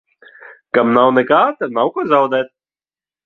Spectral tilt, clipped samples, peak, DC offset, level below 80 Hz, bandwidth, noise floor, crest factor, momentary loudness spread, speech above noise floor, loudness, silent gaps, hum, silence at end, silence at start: -7.5 dB/octave; under 0.1%; 0 dBFS; under 0.1%; -62 dBFS; 6.2 kHz; under -90 dBFS; 16 dB; 7 LU; over 76 dB; -15 LUFS; none; none; 0.8 s; 0.45 s